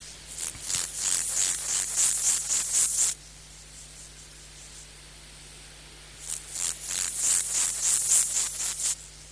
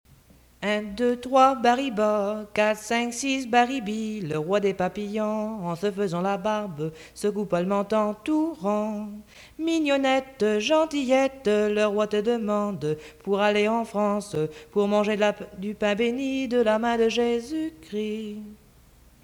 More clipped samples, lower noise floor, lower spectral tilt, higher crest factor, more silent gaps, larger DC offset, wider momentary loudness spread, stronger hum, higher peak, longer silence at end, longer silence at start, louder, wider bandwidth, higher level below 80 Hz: neither; second, -47 dBFS vs -55 dBFS; second, 1.5 dB/octave vs -5 dB/octave; first, 24 dB vs 18 dB; neither; neither; first, 24 LU vs 9 LU; neither; about the same, -6 dBFS vs -6 dBFS; second, 0 s vs 0.7 s; second, 0 s vs 0.6 s; about the same, -24 LUFS vs -25 LUFS; second, 11 kHz vs 19.5 kHz; about the same, -54 dBFS vs -58 dBFS